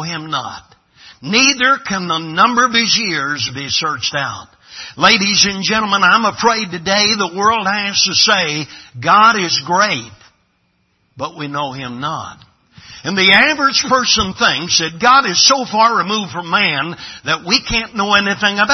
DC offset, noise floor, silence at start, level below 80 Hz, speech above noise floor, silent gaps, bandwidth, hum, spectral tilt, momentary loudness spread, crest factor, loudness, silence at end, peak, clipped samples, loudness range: under 0.1%; -62 dBFS; 0 s; -46 dBFS; 47 dB; none; 12 kHz; none; -2 dB/octave; 13 LU; 16 dB; -13 LUFS; 0 s; 0 dBFS; under 0.1%; 4 LU